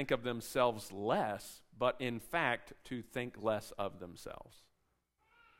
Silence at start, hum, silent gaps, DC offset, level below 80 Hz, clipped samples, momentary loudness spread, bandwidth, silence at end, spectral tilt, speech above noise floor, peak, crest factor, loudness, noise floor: 0 s; none; none; under 0.1%; -64 dBFS; under 0.1%; 16 LU; 16 kHz; 1 s; -5 dB/octave; 42 dB; -16 dBFS; 22 dB; -37 LUFS; -79 dBFS